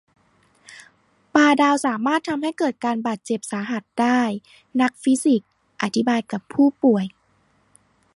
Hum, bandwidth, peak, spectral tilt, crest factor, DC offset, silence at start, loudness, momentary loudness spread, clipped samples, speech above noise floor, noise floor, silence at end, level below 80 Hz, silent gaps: none; 11.5 kHz; -2 dBFS; -4.5 dB/octave; 20 dB; under 0.1%; 0.7 s; -21 LUFS; 10 LU; under 0.1%; 42 dB; -62 dBFS; 1.1 s; -68 dBFS; none